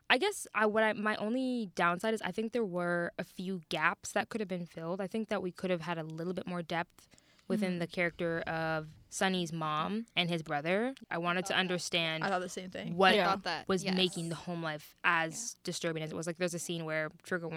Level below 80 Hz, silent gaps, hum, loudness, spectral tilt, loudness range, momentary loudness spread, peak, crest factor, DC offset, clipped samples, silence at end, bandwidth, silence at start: -70 dBFS; none; none; -34 LUFS; -4 dB/octave; 5 LU; 9 LU; -10 dBFS; 24 dB; under 0.1%; under 0.1%; 0 s; 16 kHz; 0.1 s